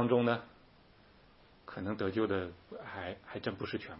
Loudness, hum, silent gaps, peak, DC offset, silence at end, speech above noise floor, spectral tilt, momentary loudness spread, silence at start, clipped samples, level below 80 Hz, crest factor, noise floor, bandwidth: -36 LUFS; none; none; -16 dBFS; under 0.1%; 0 s; 27 dB; -5 dB/octave; 17 LU; 0 s; under 0.1%; -68 dBFS; 20 dB; -62 dBFS; 5.6 kHz